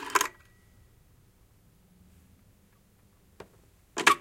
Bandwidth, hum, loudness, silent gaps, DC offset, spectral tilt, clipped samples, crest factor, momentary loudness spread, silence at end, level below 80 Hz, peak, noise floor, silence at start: 16.5 kHz; none; -28 LUFS; none; under 0.1%; -0.5 dB/octave; under 0.1%; 28 dB; 29 LU; 0 s; -64 dBFS; -6 dBFS; -62 dBFS; 0 s